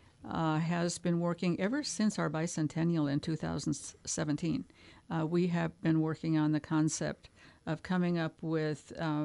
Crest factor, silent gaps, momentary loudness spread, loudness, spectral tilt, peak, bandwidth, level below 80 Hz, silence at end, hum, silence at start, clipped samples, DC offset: 16 dB; none; 8 LU; -33 LUFS; -5.5 dB/octave; -18 dBFS; 11.5 kHz; -64 dBFS; 0 s; none; 0.2 s; under 0.1%; under 0.1%